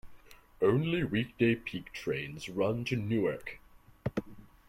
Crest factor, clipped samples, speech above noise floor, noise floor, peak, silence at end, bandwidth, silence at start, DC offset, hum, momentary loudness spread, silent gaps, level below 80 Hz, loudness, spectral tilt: 20 dB; under 0.1%; 23 dB; -54 dBFS; -14 dBFS; 0.25 s; 16.5 kHz; 0.05 s; under 0.1%; none; 12 LU; none; -58 dBFS; -33 LUFS; -7 dB/octave